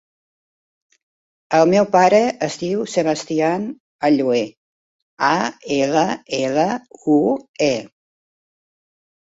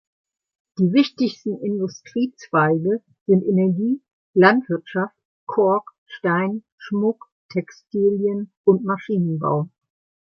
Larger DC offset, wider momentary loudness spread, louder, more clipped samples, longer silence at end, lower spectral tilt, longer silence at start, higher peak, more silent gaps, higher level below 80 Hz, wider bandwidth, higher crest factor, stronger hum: neither; about the same, 9 LU vs 11 LU; first, -18 LUFS vs -21 LUFS; neither; first, 1.4 s vs 0.7 s; second, -5 dB/octave vs -8 dB/octave; first, 1.5 s vs 0.8 s; about the same, -2 dBFS vs -2 dBFS; about the same, 3.80-3.99 s, 4.57-5.17 s, 7.49-7.54 s vs 3.21-3.26 s, 4.13-4.34 s, 5.25-5.47 s, 5.98-6.06 s, 6.72-6.78 s, 7.32-7.49 s, 8.57-8.64 s; about the same, -62 dBFS vs -66 dBFS; first, 8 kHz vs 6.6 kHz; about the same, 18 dB vs 20 dB; neither